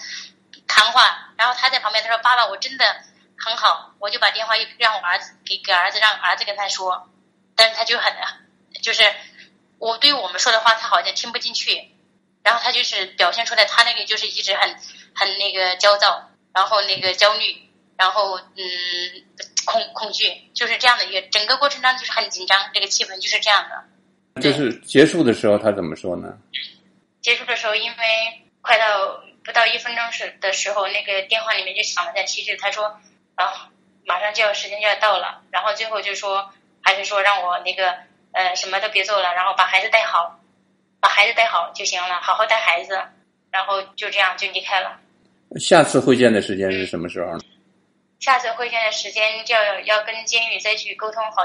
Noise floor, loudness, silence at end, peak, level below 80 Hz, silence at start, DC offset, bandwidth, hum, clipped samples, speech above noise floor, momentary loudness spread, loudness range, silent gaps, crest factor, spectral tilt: -63 dBFS; -18 LUFS; 0 s; 0 dBFS; -68 dBFS; 0 s; under 0.1%; 11.5 kHz; none; under 0.1%; 43 dB; 12 LU; 4 LU; none; 20 dB; -2 dB/octave